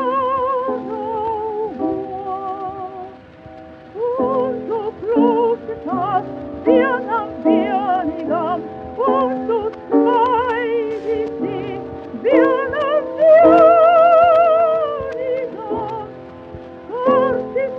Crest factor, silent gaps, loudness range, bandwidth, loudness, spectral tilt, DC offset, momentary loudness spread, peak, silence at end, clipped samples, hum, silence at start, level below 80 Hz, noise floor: 16 dB; none; 11 LU; 5.6 kHz; -17 LUFS; -8 dB/octave; under 0.1%; 17 LU; 0 dBFS; 0 s; under 0.1%; none; 0 s; -54 dBFS; -39 dBFS